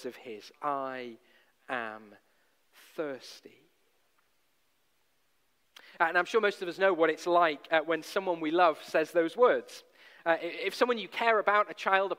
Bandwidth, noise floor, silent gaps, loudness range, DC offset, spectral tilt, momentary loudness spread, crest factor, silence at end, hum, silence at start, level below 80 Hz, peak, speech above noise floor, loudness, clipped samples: 16 kHz; -75 dBFS; none; 19 LU; under 0.1%; -4 dB/octave; 18 LU; 22 dB; 0.05 s; none; 0 s; -84 dBFS; -10 dBFS; 46 dB; -29 LUFS; under 0.1%